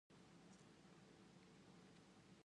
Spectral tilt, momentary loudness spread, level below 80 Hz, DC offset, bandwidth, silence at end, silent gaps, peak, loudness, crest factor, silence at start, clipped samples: -5 dB/octave; 1 LU; -88 dBFS; under 0.1%; 10.5 kHz; 0 s; none; -52 dBFS; -67 LUFS; 14 dB; 0.1 s; under 0.1%